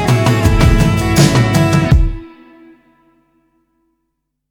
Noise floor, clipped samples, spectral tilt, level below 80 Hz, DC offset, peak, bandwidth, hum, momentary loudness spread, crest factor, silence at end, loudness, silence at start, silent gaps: -71 dBFS; under 0.1%; -6 dB/octave; -20 dBFS; under 0.1%; 0 dBFS; 19.5 kHz; none; 4 LU; 14 dB; 2.25 s; -12 LUFS; 0 s; none